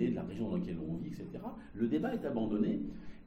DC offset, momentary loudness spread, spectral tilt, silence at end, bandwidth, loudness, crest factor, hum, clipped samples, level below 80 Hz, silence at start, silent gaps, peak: under 0.1%; 11 LU; -9 dB/octave; 0 s; 8 kHz; -37 LUFS; 16 dB; none; under 0.1%; -56 dBFS; 0 s; none; -20 dBFS